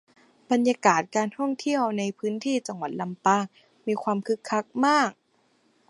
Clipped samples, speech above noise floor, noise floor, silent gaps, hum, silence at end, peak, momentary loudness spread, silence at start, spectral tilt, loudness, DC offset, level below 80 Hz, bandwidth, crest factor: under 0.1%; 41 dB; -66 dBFS; none; none; 0.75 s; -4 dBFS; 9 LU; 0.5 s; -4.5 dB/octave; -26 LUFS; under 0.1%; -80 dBFS; 11.5 kHz; 22 dB